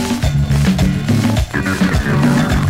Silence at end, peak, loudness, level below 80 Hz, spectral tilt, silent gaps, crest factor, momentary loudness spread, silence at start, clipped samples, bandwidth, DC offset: 0 s; -2 dBFS; -15 LUFS; -24 dBFS; -6 dB/octave; none; 12 dB; 3 LU; 0 s; under 0.1%; 16 kHz; 0.2%